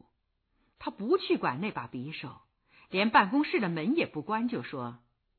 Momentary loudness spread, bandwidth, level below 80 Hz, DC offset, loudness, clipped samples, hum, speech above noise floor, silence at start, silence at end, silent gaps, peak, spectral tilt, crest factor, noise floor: 17 LU; 4.6 kHz; -70 dBFS; under 0.1%; -30 LUFS; under 0.1%; none; 47 dB; 0.8 s; 0.45 s; none; -8 dBFS; -9 dB/octave; 22 dB; -76 dBFS